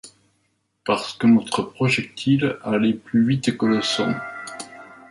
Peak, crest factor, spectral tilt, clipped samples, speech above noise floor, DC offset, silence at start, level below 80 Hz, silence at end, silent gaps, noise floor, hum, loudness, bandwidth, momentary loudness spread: -6 dBFS; 16 dB; -5.5 dB/octave; under 0.1%; 49 dB; under 0.1%; 0.05 s; -60 dBFS; 0.15 s; none; -69 dBFS; none; -21 LUFS; 11.5 kHz; 15 LU